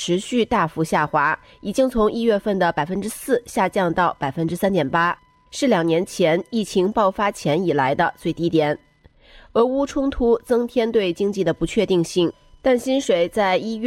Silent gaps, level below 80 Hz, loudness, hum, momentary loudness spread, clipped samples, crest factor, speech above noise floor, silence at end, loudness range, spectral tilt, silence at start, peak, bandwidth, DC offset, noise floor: none; -46 dBFS; -20 LUFS; none; 5 LU; under 0.1%; 14 dB; 31 dB; 0 s; 1 LU; -5.5 dB/octave; 0 s; -6 dBFS; 16 kHz; under 0.1%; -51 dBFS